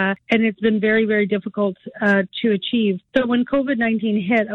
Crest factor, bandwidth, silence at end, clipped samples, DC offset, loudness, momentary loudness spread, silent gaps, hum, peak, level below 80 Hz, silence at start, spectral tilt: 14 dB; 6.2 kHz; 0 s; under 0.1%; under 0.1%; -19 LUFS; 5 LU; none; none; -4 dBFS; -56 dBFS; 0 s; -7.5 dB/octave